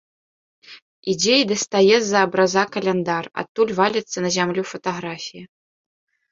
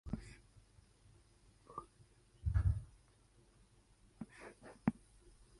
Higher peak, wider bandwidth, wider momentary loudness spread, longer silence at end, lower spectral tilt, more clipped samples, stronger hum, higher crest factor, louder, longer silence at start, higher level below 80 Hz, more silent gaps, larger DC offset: first, -2 dBFS vs -20 dBFS; second, 7.8 kHz vs 11.5 kHz; second, 13 LU vs 25 LU; first, 0.85 s vs 0.65 s; second, -3.5 dB/octave vs -8 dB/octave; neither; neither; second, 20 dB vs 26 dB; first, -20 LUFS vs -43 LUFS; first, 0.7 s vs 0.05 s; second, -64 dBFS vs -50 dBFS; first, 0.82-1.03 s, 3.49-3.55 s vs none; neither